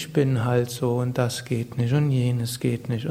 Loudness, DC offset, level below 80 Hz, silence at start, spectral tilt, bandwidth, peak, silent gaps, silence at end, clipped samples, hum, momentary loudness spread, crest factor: -24 LUFS; under 0.1%; -56 dBFS; 0 s; -6.5 dB/octave; 16 kHz; -8 dBFS; none; 0 s; under 0.1%; none; 5 LU; 16 dB